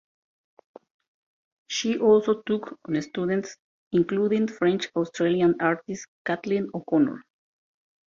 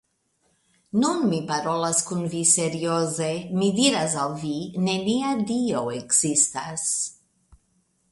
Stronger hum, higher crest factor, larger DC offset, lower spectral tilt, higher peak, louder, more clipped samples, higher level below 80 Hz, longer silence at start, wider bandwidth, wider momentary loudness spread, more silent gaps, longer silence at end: neither; about the same, 18 dB vs 22 dB; neither; first, -5.5 dB/octave vs -3.5 dB/octave; second, -8 dBFS vs -4 dBFS; about the same, -25 LUFS vs -23 LUFS; neither; about the same, -66 dBFS vs -64 dBFS; first, 1.7 s vs 0.95 s; second, 7.4 kHz vs 12 kHz; about the same, 10 LU vs 8 LU; first, 3.60-3.91 s, 6.08-6.25 s vs none; first, 0.9 s vs 0.55 s